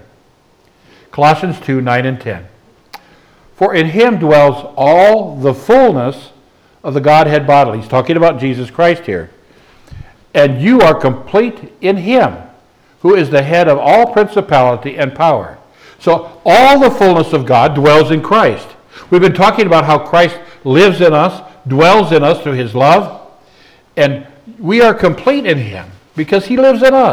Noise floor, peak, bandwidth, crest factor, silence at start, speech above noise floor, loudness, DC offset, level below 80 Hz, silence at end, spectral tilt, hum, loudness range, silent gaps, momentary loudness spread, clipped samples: -50 dBFS; 0 dBFS; 20 kHz; 10 dB; 1.15 s; 41 dB; -10 LUFS; under 0.1%; -46 dBFS; 0 s; -6.5 dB/octave; none; 4 LU; none; 11 LU; under 0.1%